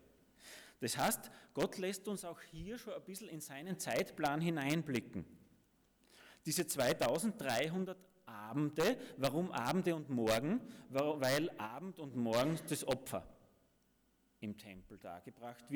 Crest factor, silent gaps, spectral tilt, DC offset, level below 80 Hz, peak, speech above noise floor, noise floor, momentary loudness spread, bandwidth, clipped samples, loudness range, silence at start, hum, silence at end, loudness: 18 dB; none; -4.5 dB/octave; under 0.1%; -70 dBFS; -22 dBFS; 37 dB; -75 dBFS; 17 LU; over 20 kHz; under 0.1%; 5 LU; 0.4 s; none; 0 s; -39 LUFS